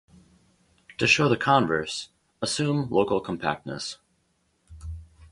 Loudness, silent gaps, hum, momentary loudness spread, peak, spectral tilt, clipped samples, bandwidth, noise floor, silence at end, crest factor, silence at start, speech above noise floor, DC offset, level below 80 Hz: -25 LUFS; none; none; 23 LU; -4 dBFS; -4.5 dB/octave; under 0.1%; 11.5 kHz; -70 dBFS; 0.05 s; 22 dB; 1 s; 46 dB; under 0.1%; -50 dBFS